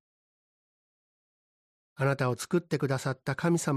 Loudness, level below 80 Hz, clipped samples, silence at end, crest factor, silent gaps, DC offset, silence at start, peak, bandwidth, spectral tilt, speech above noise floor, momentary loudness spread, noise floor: -30 LUFS; -68 dBFS; under 0.1%; 0 s; 16 dB; none; under 0.1%; 2 s; -14 dBFS; 14.5 kHz; -6 dB/octave; over 61 dB; 4 LU; under -90 dBFS